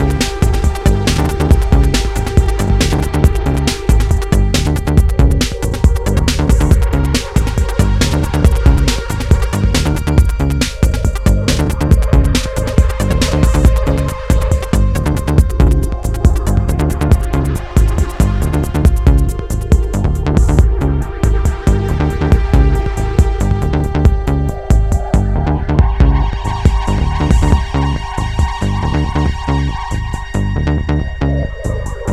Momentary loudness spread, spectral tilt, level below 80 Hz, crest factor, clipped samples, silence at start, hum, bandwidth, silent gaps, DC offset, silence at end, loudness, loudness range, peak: 5 LU; -6 dB/octave; -14 dBFS; 12 dB; under 0.1%; 0 s; none; 14.5 kHz; none; under 0.1%; 0 s; -14 LUFS; 2 LU; 0 dBFS